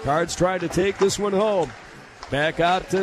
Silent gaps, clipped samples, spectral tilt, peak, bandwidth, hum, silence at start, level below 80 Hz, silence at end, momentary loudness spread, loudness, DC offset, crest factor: none; under 0.1%; -4.5 dB/octave; -8 dBFS; 14 kHz; none; 0 s; -46 dBFS; 0 s; 14 LU; -22 LUFS; under 0.1%; 14 dB